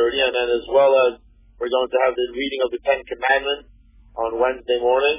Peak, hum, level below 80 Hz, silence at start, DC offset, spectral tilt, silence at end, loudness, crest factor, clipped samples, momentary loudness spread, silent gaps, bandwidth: -4 dBFS; none; -50 dBFS; 0 s; under 0.1%; -7 dB/octave; 0 s; -20 LUFS; 16 dB; under 0.1%; 10 LU; none; 3.8 kHz